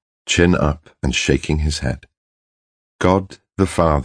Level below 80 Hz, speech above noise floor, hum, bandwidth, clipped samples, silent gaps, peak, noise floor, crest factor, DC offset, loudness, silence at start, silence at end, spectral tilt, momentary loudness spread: -30 dBFS; over 73 dB; none; 10.5 kHz; under 0.1%; 2.17-2.99 s; 0 dBFS; under -90 dBFS; 20 dB; under 0.1%; -19 LUFS; 0.25 s; 0 s; -5 dB/octave; 9 LU